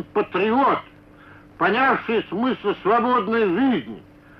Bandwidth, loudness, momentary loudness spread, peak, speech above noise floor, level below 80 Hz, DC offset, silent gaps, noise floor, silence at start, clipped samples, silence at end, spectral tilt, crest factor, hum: 5.8 kHz; -21 LUFS; 7 LU; -8 dBFS; 26 dB; -58 dBFS; under 0.1%; none; -47 dBFS; 0 s; under 0.1%; 0.4 s; -8 dB/octave; 12 dB; none